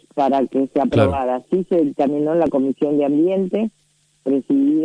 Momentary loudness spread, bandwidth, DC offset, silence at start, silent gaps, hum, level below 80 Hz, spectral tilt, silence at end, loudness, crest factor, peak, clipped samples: 5 LU; 9.8 kHz; under 0.1%; 0.15 s; none; none; -48 dBFS; -9 dB/octave; 0 s; -19 LUFS; 16 dB; -2 dBFS; under 0.1%